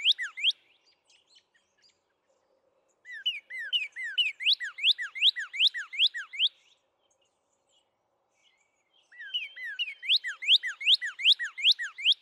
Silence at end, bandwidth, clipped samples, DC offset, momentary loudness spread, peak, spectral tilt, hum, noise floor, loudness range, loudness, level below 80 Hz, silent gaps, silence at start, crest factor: 0.05 s; 13 kHz; under 0.1%; under 0.1%; 11 LU; -14 dBFS; 6 dB/octave; none; -76 dBFS; 13 LU; -26 LUFS; under -90 dBFS; none; 0 s; 18 dB